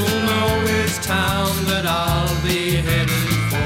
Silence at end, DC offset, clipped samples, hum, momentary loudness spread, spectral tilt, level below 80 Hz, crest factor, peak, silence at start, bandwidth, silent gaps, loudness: 0 s; under 0.1%; under 0.1%; none; 2 LU; -4.5 dB/octave; -32 dBFS; 12 dB; -8 dBFS; 0 s; 16.5 kHz; none; -19 LUFS